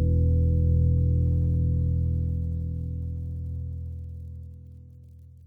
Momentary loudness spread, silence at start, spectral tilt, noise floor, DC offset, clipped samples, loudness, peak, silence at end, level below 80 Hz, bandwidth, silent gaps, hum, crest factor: 18 LU; 0 s; -13 dB/octave; -48 dBFS; under 0.1%; under 0.1%; -26 LUFS; -12 dBFS; 0.2 s; -30 dBFS; 0.7 kHz; none; none; 12 dB